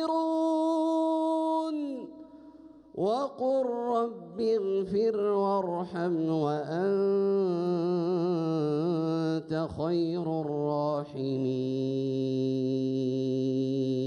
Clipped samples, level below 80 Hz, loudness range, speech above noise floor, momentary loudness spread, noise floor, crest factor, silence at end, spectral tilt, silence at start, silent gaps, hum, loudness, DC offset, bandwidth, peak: under 0.1%; -68 dBFS; 2 LU; 23 dB; 5 LU; -51 dBFS; 12 dB; 0 s; -8.5 dB/octave; 0 s; none; none; -29 LUFS; under 0.1%; 10 kHz; -18 dBFS